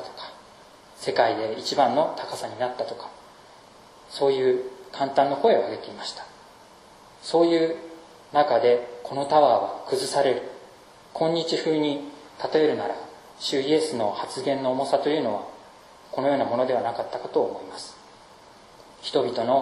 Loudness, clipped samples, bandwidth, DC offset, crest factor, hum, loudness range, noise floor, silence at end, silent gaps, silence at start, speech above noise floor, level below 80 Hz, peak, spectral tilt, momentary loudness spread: -24 LUFS; under 0.1%; 13.5 kHz; under 0.1%; 20 dB; none; 5 LU; -50 dBFS; 0 s; none; 0 s; 26 dB; -68 dBFS; -6 dBFS; -4.5 dB/octave; 18 LU